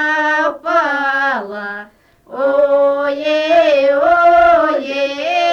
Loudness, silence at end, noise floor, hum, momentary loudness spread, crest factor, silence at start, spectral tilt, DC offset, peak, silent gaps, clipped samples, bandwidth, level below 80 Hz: -13 LUFS; 0 s; -43 dBFS; none; 12 LU; 12 dB; 0 s; -3.5 dB/octave; under 0.1%; -2 dBFS; none; under 0.1%; 7.2 kHz; -50 dBFS